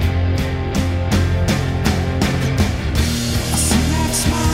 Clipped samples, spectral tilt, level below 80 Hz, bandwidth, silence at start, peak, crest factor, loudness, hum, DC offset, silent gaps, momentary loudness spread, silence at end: under 0.1%; -5 dB/octave; -24 dBFS; 16.5 kHz; 0 s; -2 dBFS; 14 dB; -18 LUFS; none; under 0.1%; none; 4 LU; 0 s